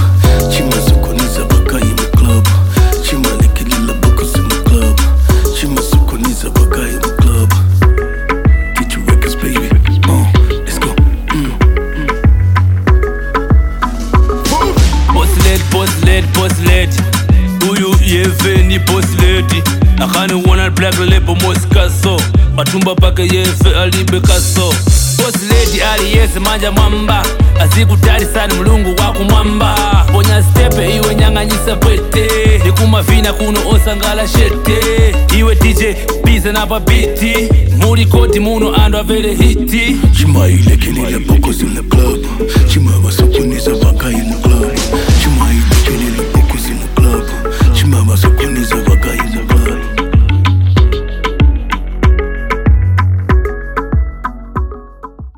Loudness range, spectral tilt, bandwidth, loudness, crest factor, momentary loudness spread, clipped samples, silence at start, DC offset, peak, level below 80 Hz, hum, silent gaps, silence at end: 2 LU; -5 dB/octave; 17.5 kHz; -11 LUFS; 10 dB; 5 LU; under 0.1%; 0 s; 0.3%; 0 dBFS; -12 dBFS; none; none; 0.1 s